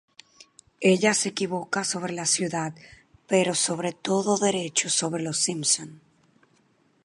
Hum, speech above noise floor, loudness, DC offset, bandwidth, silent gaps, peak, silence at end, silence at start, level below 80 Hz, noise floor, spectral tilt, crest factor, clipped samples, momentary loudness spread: none; 39 dB; -24 LUFS; under 0.1%; 11.5 kHz; none; -6 dBFS; 1.05 s; 0.8 s; -70 dBFS; -64 dBFS; -3 dB/octave; 20 dB; under 0.1%; 8 LU